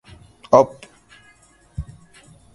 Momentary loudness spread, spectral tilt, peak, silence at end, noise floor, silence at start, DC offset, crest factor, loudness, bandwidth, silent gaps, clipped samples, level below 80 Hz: 22 LU; -6.5 dB/octave; 0 dBFS; 0.75 s; -54 dBFS; 0.5 s; under 0.1%; 24 dB; -17 LUFS; 11.5 kHz; none; under 0.1%; -44 dBFS